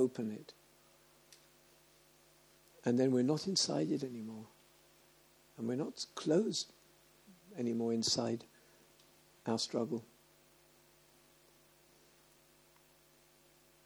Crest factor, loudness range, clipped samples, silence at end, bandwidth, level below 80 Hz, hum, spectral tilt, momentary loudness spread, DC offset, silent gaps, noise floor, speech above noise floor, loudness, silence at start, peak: 22 dB; 7 LU; under 0.1%; 3.8 s; over 20 kHz; -82 dBFS; none; -4.5 dB/octave; 14 LU; under 0.1%; none; -67 dBFS; 31 dB; -36 LUFS; 0 s; -18 dBFS